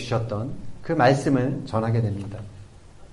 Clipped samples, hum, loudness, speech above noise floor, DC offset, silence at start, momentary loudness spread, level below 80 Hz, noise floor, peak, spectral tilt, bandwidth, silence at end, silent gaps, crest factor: under 0.1%; none; -24 LUFS; 22 dB; under 0.1%; 0 s; 18 LU; -48 dBFS; -45 dBFS; -6 dBFS; -7 dB/octave; 11.5 kHz; 0 s; none; 18 dB